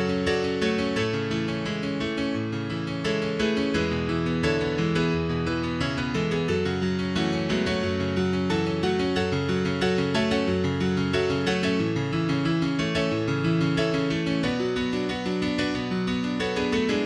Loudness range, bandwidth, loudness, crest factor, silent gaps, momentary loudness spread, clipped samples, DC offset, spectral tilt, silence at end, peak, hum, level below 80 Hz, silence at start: 2 LU; 11 kHz; -25 LUFS; 14 dB; none; 3 LU; under 0.1%; under 0.1%; -6 dB/octave; 0 s; -10 dBFS; none; -46 dBFS; 0 s